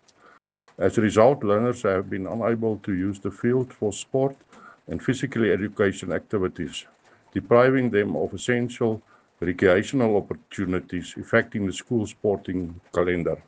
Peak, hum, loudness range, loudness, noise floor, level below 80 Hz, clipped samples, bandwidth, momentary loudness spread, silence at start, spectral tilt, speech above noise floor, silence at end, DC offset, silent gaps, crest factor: -4 dBFS; none; 4 LU; -24 LUFS; -57 dBFS; -56 dBFS; under 0.1%; 9.6 kHz; 12 LU; 0.8 s; -6.5 dB/octave; 33 dB; 0.05 s; under 0.1%; none; 20 dB